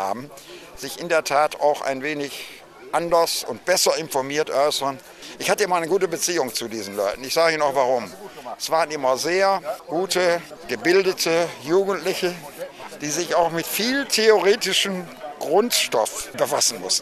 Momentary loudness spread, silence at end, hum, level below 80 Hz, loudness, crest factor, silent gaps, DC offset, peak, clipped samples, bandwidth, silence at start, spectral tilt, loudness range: 15 LU; 0 s; none; -60 dBFS; -21 LUFS; 20 dB; none; under 0.1%; -2 dBFS; under 0.1%; 14 kHz; 0 s; -2.5 dB/octave; 3 LU